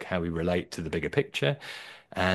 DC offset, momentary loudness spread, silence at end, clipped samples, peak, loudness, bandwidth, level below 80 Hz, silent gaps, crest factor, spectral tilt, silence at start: under 0.1%; 11 LU; 0 s; under 0.1%; -8 dBFS; -30 LUFS; 12.5 kHz; -52 dBFS; none; 22 dB; -5.5 dB/octave; 0 s